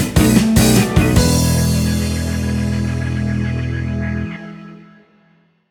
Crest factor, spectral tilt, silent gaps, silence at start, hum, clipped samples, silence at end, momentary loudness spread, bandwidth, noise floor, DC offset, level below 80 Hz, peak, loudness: 16 dB; -5.5 dB/octave; none; 0 s; none; under 0.1%; 0.85 s; 11 LU; over 20 kHz; -55 dBFS; under 0.1%; -26 dBFS; 0 dBFS; -16 LUFS